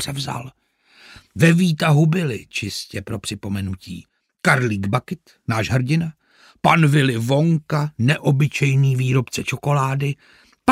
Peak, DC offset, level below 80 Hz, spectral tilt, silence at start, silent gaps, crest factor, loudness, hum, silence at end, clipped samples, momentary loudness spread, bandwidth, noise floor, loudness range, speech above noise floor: -2 dBFS; under 0.1%; -54 dBFS; -6 dB/octave; 0 s; none; 18 dB; -19 LUFS; none; 0 s; under 0.1%; 14 LU; 15.5 kHz; -50 dBFS; 5 LU; 31 dB